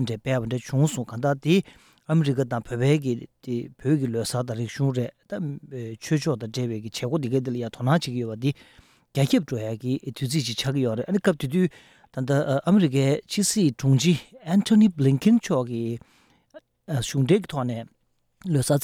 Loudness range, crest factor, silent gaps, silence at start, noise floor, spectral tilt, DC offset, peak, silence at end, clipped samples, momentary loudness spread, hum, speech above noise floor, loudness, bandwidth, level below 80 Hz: 6 LU; 16 dB; none; 0 s; -52 dBFS; -6 dB/octave; under 0.1%; -8 dBFS; 0 s; under 0.1%; 12 LU; none; 28 dB; -24 LUFS; 16 kHz; -58 dBFS